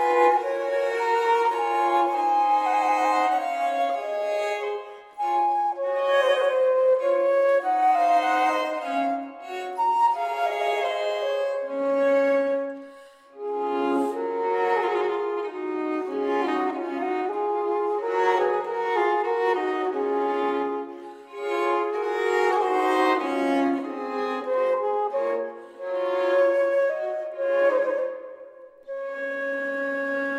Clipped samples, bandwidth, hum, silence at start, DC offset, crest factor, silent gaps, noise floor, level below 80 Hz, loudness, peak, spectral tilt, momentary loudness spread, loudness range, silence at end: under 0.1%; 13 kHz; none; 0 s; under 0.1%; 16 dB; none; -48 dBFS; -80 dBFS; -24 LUFS; -8 dBFS; -3.5 dB/octave; 9 LU; 4 LU; 0 s